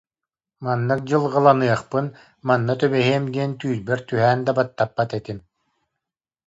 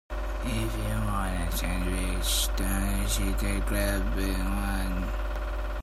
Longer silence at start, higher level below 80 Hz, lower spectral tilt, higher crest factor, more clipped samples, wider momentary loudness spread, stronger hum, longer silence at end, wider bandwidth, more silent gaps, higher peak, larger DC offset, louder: first, 0.6 s vs 0.1 s; second, -60 dBFS vs -30 dBFS; first, -7 dB/octave vs -4 dB/octave; about the same, 20 dB vs 16 dB; neither; first, 14 LU vs 7 LU; neither; first, 1.1 s vs 0 s; second, 8 kHz vs 15.5 kHz; neither; first, -2 dBFS vs -12 dBFS; neither; first, -21 LUFS vs -30 LUFS